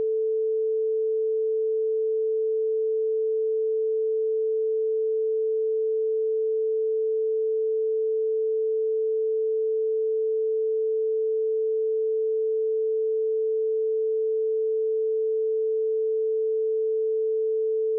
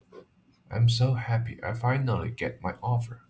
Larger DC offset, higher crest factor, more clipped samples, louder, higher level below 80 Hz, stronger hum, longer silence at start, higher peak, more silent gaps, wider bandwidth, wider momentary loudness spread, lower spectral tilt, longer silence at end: neither; second, 4 dB vs 14 dB; neither; first, -25 LUFS vs -28 LUFS; second, under -90 dBFS vs -50 dBFS; neither; second, 0 s vs 0.15 s; second, -22 dBFS vs -14 dBFS; neither; second, 0.5 kHz vs 8 kHz; second, 0 LU vs 9 LU; second, 1 dB/octave vs -6.5 dB/octave; about the same, 0 s vs 0.1 s